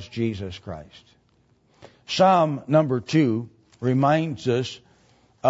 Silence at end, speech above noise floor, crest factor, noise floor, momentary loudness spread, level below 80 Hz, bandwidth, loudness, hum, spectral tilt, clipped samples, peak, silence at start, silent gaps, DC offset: 0 s; 40 dB; 18 dB; -62 dBFS; 19 LU; -60 dBFS; 8 kHz; -22 LUFS; none; -6.5 dB/octave; under 0.1%; -6 dBFS; 0 s; none; under 0.1%